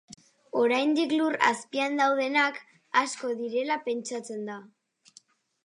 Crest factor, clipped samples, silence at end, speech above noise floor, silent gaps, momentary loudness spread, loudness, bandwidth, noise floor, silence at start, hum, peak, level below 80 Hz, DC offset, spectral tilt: 22 dB; under 0.1%; 1 s; 33 dB; none; 12 LU; -27 LUFS; 11.5 kHz; -60 dBFS; 0.1 s; none; -6 dBFS; -84 dBFS; under 0.1%; -3 dB/octave